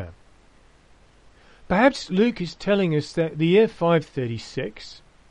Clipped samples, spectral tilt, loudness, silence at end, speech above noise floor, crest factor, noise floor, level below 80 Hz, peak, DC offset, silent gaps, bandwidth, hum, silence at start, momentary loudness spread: under 0.1%; -6.5 dB/octave; -22 LUFS; 0.35 s; 32 dB; 20 dB; -54 dBFS; -50 dBFS; -4 dBFS; under 0.1%; none; 10 kHz; none; 0 s; 14 LU